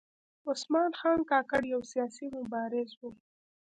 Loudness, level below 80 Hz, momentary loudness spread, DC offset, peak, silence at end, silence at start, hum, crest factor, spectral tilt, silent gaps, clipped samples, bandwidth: -32 LUFS; -68 dBFS; 13 LU; under 0.1%; -14 dBFS; 0.6 s; 0.45 s; none; 18 dB; -4 dB/octave; 2.97-3.01 s; under 0.1%; 9.4 kHz